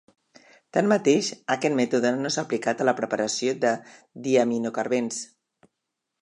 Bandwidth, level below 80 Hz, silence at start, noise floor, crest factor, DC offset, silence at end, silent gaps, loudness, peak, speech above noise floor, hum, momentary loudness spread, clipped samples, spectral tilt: 11 kHz; -76 dBFS; 0.75 s; -82 dBFS; 18 dB; under 0.1%; 0.95 s; none; -25 LUFS; -6 dBFS; 58 dB; none; 8 LU; under 0.1%; -4 dB/octave